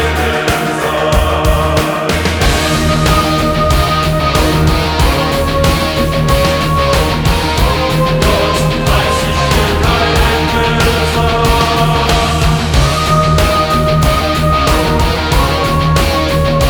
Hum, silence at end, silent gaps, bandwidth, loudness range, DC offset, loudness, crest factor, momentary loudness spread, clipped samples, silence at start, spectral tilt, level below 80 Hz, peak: none; 0 s; none; over 20 kHz; 1 LU; under 0.1%; -12 LUFS; 10 dB; 2 LU; under 0.1%; 0 s; -5 dB/octave; -18 dBFS; 0 dBFS